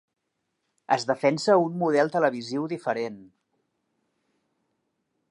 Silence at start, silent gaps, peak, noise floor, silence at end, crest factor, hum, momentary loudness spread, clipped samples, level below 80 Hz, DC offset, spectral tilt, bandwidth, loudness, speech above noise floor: 0.9 s; none; -6 dBFS; -79 dBFS; 2.05 s; 22 dB; none; 9 LU; under 0.1%; -80 dBFS; under 0.1%; -5.5 dB/octave; 11 kHz; -25 LUFS; 54 dB